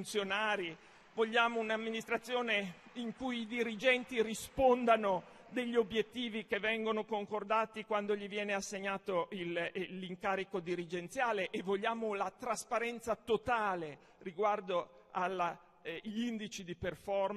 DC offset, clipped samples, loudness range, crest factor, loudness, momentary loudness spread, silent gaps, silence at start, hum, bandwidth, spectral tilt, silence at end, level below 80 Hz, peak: under 0.1%; under 0.1%; 4 LU; 20 dB; -36 LUFS; 11 LU; none; 0 s; none; 13 kHz; -4 dB/octave; 0 s; -68 dBFS; -16 dBFS